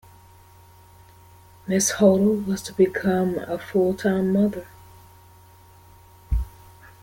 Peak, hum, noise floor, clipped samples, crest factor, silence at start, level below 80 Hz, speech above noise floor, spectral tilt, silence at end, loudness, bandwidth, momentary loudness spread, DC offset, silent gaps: -4 dBFS; none; -50 dBFS; under 0.1%; 20 dB; 1.65 s; -38 dBFS; 29 dB; -5.5 dB/octave; 0.55 s; -22 LUFS; 17 kHz; 12 LU; under 0.1%; none